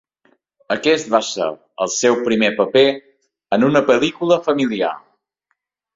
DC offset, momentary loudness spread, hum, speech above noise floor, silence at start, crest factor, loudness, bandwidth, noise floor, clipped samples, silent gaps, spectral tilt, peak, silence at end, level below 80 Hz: under 0.1%; 10 LU; none; 55 dB; 0.7 s; 16 dB; -17 LUFS; 7.8 kHz; -72 dBFS; under 0.1%; none; -4 dB/octave; -2 dBFS; 0.95 s; -60 dBFS